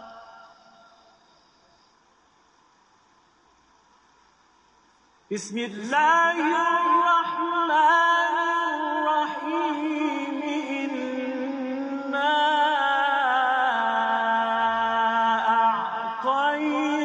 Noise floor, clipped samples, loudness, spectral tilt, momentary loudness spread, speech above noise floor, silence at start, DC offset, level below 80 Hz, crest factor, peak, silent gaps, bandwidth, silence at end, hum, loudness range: -61 dBFS; under 0.1%; -23 LUFS; -3 dB/octave; 10 LU; 39 dB; 0 s; under 0.1%; -72 dBFS; 16 dB; -10 dBFS; none; 9.6 kHz; 0 s; none; 6 LU